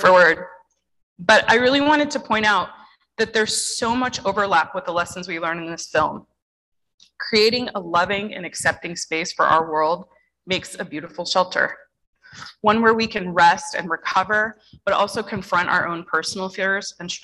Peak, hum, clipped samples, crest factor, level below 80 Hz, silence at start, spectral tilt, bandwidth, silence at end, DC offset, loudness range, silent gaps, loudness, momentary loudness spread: -2 dBFS; none; under 0.1%; 18 dB; -54 dBFS; 0 s; -3 dB/octave; 12.5 kHz; 0.05 s; under 0.1%; 4 LU; 1.03-1.16 s, 6.42-6.72 s, 6.94-6.98 s, 12.07-12.13 s; -20 LUFS; 13 LU